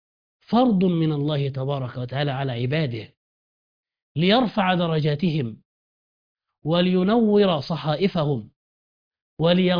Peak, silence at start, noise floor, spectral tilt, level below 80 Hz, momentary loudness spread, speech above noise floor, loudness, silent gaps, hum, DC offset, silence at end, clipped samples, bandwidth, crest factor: -4 dBFS; 0.5 s; under -90 dBFS; -9 dB/octave; -56 dBFS; 10 LU; over 69 dB; -22 LUFS; 3.17-3.83 s, 4.02-4.15 s, 5.65-6.35 s, 8.56-9.11 s, 9.22-9.37 s; none; under 0.1%; 0 s; under 0.1%; 5.2 kHz; 18 dB